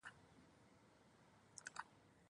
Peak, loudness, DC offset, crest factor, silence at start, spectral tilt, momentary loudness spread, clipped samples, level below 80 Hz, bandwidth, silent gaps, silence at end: -32 dBFS; -58 LUFS; under 0.1%; 30 dB; 0 s; -2 dB/octave; 15 LU; under 0.1%; -86 dBFS; 10.5 kHz; none; 0 s